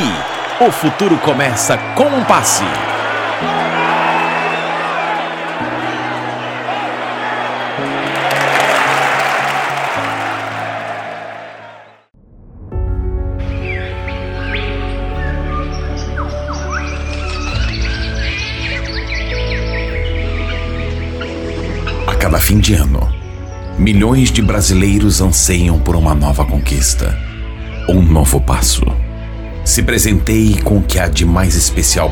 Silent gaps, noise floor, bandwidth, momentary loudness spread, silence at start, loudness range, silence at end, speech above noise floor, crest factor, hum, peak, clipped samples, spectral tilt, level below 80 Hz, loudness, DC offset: none; -44 dBFS; 17.5 kHz; 11 LU; 0 s; 9 LU; 0 s; 33 dB; 14 dB; none; 0 dBFS; under 0.1%; -4.5 dB/octave; -20 dBFS; -15 LUFS; under 0.1%